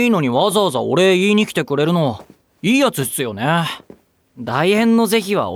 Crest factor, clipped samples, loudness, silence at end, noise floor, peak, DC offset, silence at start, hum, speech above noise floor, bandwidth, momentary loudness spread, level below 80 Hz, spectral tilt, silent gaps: 14 dB; under 0.1%; -16 LUFS; 0 s; -46 dBFS; -4 dBFS; under 0.1%; 0 s; none; 30 dB; 17.5 kHz; 9 LU; -60 dBFS; -5 dB/octave; none